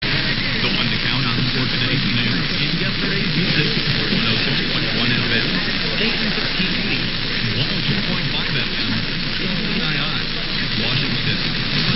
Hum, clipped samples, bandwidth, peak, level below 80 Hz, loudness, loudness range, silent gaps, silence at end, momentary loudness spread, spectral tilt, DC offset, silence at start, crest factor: none; under 0.1%; 5.8 kHz; -2 dBFS; -30 dBFS; -19 LUFS; 2 LU; none; 0 s; 3 LU; -7.5 dB/octave; under 0.1%; 0 s; 16 dB